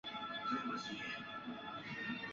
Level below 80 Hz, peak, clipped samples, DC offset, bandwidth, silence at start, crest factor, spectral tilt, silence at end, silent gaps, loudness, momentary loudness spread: -76 dBFS; -26 dBFS; under 0.1%; under 0.1%; 7.4 kHz; 0.05 s; 18 dB; -1.5 dB/octave; 0 s; none; -43 LUFS; 7 LU